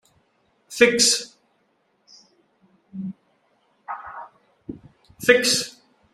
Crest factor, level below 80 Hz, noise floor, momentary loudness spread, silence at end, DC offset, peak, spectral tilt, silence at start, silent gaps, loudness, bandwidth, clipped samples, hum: 24 dB; -64 dBFS; -67 dBFS; 25 LU; 0.45 s; under 0.1%; 0 dBFS; -1.5 dB/octave; 0.7 s; none; -18 LUFS; 15.5 kHz; under 0.1%; none